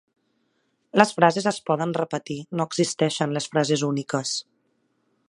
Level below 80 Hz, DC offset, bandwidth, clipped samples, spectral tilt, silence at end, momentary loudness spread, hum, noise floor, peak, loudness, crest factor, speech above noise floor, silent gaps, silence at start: -72 dBFS; under 0.1%; 11.5 kHz; under 0.1%; -4.5 dB/octave; 0.9 s; 9 LU; none; -71 dBFS; 0 dBFS; -24 LUFS; 24 dB; 48 dB; none; 0.95 s